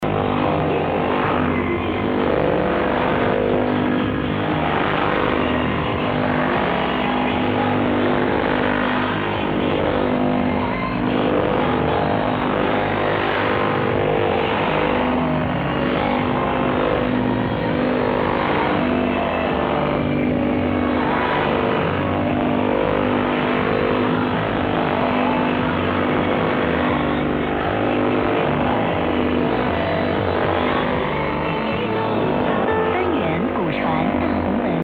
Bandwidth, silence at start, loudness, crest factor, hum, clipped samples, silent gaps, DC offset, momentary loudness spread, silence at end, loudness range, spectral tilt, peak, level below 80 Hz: 16.5 kHz; 0 s; -20 LUFS; 14 dB; none; under 0.1%; none; under 0.1%; 2 LU; 0 s; 1 LU; -9 dB/octave; -6 dBFS; -38 dBFS